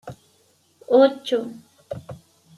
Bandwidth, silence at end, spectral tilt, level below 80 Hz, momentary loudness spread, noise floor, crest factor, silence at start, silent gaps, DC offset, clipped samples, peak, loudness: 12 kHz; 0.4 s; -6 dB/octave; -66 dBFS; 24 LU; -61 dBFS; 20 dB; 0.05 s; none; under 0.1%; under 0.1%; -4 dBFS; -19 LUFS